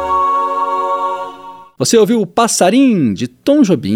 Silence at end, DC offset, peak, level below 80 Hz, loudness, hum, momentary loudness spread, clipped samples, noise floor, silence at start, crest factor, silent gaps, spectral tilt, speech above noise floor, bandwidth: 0 s; under 0.1%; 0 dBFS; -50 dBFS; -13 LUFS; none; 9 LU; under 0.1%; -34 dBFS; 0 s; 14 dB; none; -4.5 dB/octave; 22 dB; 16.5 kHz